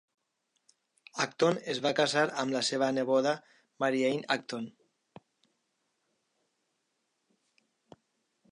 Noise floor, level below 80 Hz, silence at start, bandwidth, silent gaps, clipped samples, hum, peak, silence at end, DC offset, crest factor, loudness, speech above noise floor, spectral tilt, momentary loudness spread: -80 dBFS; -84 dBFS; 1.15 s; 11.5 kHz; none; under 0.1%; none; -12 dBFS; 3.8 s; under 0.1%; 22 dB; -30 LUFS; 50 dB; -4 dB/octave; 11 LU